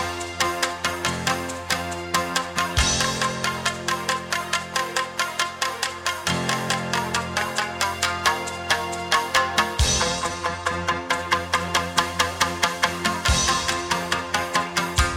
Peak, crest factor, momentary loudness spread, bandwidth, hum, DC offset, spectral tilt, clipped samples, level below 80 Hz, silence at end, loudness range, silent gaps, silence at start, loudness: -4 dBFS; 20 dB; 5 LU; 18 kHz; none; under 0.1%; -2.5 dB/octave; under 0.1%; -38 dBFS; 0 s; 2 LU; none; 0 s; -23 LUFS